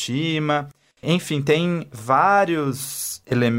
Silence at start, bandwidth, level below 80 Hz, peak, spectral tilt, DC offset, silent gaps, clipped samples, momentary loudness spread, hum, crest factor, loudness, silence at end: 0 s; 16.5 kHz; -60 dBFS; -4 dBFS; -5 dB/octave; under 0.1%; none; under 0.1%; 11 LU; none; 16 dB; -21 LUFS; 0 s